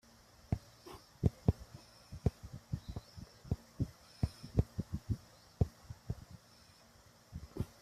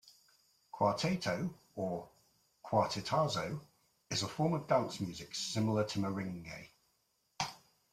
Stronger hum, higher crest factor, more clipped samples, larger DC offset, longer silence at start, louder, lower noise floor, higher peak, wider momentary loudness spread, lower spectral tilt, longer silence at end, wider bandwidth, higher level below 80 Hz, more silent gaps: neither; about the same, 26 dB vs 22 dB; neither; neither; first, 0.5 s vs 0.05 s; second, -41 LUFS vs -36 LUFS; second, -63 dBFS vs -78 dBFS; about the same, -16 dBFS vs -16 dBFS; first, 21 LU vs 12 LU; first, -8 dB/octave vs -5 dB/octave; second, 0.15 s vs 0.35 s; about the same, 14.5 kHz vs 15.5 kHz; first, -50 dBFS vs -70 dBFS; neither